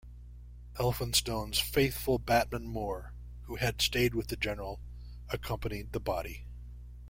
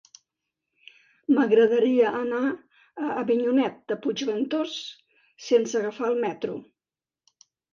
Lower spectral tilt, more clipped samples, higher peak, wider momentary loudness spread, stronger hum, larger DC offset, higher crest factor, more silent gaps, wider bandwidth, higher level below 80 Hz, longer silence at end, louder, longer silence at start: about the same, -4 dB/octave vs -5 dB/octave; neither; about the same, -12 dBFS vs -10 dBFS; first, 20 LU vs 17 LU; first, 60 Hz at -45 dBFS vs none; neither; first, 22 dB vs 16 dB; neither; first, 16.5 kHz vs 7.4 kHz; first, -44 dBFS vs -76 dBFS; second, 0 s vs 1.1 s; second, -32 LUFS vs -25 LUFS; second, 0.05 s vs 1.3 s